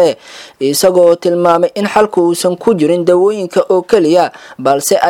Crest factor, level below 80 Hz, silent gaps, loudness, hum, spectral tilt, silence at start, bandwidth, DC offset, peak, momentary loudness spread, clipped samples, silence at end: 10 dB; -54 dBFS; none; -11 LUFS; none; -4.5 dB/octave; 0 s; 17.5 kHz; under 0.1%; 0 dBFS; 6 LU; 0.2%; 0 s